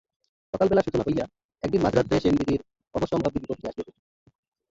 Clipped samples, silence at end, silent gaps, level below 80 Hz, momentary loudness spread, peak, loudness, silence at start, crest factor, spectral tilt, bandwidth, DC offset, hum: under 0.1%; 0.9 s; 1.45-1.49 s; -48 dBFS; 14 LU; -8 dBFS; -26 LUFS; 0.55 s; 18 dB; -7.5 dB/octave; 7.8 kHz; under 0.1%; none